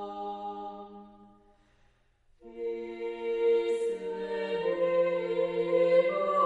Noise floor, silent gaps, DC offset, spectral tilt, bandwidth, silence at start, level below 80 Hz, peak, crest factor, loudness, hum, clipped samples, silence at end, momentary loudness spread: -66 dBFS; none; under 0.1%; -6 dB/octave; 10.5 kHz; 0 s; -68 dBFS; -14 dBFS; 16 dB; -30 LUFS; none; under 0.1%; 0 s; 15 LU